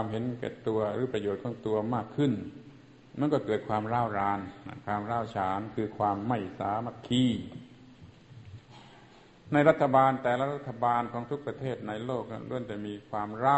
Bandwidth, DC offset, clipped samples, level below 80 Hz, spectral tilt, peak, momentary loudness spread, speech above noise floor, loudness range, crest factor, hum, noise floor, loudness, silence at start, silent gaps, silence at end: 8.4 kHz; under 0.1%; under 0.1%; -60 dBFS; -7.5 dB/octave; -8 dBFS; 13 LU; 25 dB; 5 LU; 24 dB; none; -55 dBFS; -30 LUFS; 0 s; none; 0 s